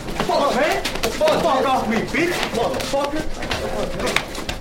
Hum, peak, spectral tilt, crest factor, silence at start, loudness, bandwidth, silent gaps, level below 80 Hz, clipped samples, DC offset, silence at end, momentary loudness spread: none; 0 dBFS; -4 dB/octave; 20 dB; 0 s; -21 LUFS; 16.5 kHz; none; -34 dBFS; under 0.1%; under 0.1%; 0 s; 7 LU